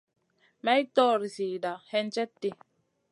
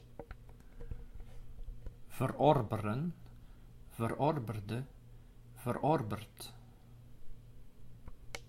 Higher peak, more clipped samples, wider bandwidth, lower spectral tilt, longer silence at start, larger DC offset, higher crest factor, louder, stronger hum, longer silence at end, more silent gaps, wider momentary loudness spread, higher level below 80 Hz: first, -10 dBFS vs -14 dBFS; neither; second, 11.5 kHz vs 16.5 kHz; second, -4.5 dB/octave vs -7 dB/octave; first, 0.65 s vs 0 s; neither; second, 20 dB vs 26 dB; first, -29 LUFS vs -35 LUFS; neither; first, 0.6 s vs 0 s; neither; second, 10 LU vs 26 LU; second, -84 dBFS vs -52 dBFS